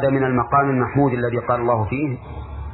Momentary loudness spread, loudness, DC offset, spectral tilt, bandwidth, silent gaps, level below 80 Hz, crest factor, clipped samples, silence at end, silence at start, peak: 12 LU; -20 LUFS; under 0.1%; -12.5 dB/octave; 4.1 kHz; none; -40 dBFS; 14 dB; under 0.1%; 0 s; 0 s; -4 dBFS